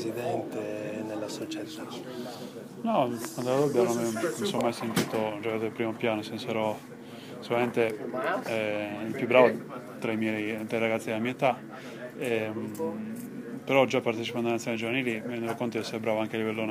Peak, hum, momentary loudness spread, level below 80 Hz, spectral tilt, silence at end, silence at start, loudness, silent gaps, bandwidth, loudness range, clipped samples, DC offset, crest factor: -6 dBFS; none; 14 LU; -74 dBFS; -5 dB/octave; 0 s; 0 s; -30 LUFS; none; 16 kHz; 3 LU; under 0.1%; under 0.1%; 24 dB